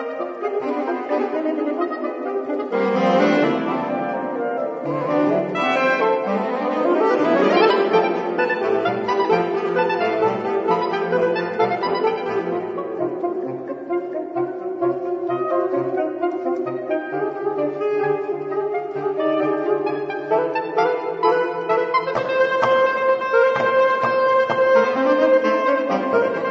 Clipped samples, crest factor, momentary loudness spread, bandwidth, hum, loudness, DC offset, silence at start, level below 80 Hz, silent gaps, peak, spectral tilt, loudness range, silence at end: under 0.1%; 16 dB; 8 LU; 7.4 kHz; none; -20 LUFS; under 0.1%; 0 s; -68 dBFS; none; -4 dBFS; -6.5 dB/octave; 6 LU; 0 s